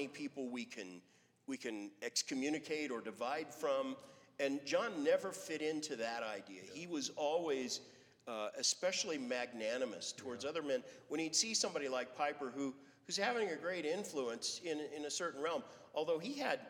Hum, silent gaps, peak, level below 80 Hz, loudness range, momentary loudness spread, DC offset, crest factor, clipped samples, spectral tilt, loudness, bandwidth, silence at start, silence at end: none; none; -20 dBFS; -90 dBFS; 3 LU; 10 LU; under 0.1%; 22 dB; under 0.1%; -2 dB/octave; -40 LUFS; 18.5 kHz; 0 s; 0 s